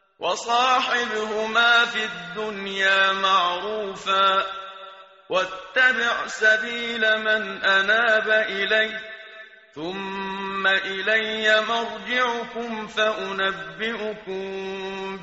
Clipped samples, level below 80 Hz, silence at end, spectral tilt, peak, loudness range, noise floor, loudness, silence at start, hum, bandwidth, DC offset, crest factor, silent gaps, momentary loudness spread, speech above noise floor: under 0.1%; -62 dBFS; 0 s; 0.5 dB/octave; -6 dBFS; 4 LU; -45 dBFS; -22 LUFS; 0.2 s; none; 8 kHz; under 0.1%; 16 dB; none; 13 LU; 22 dB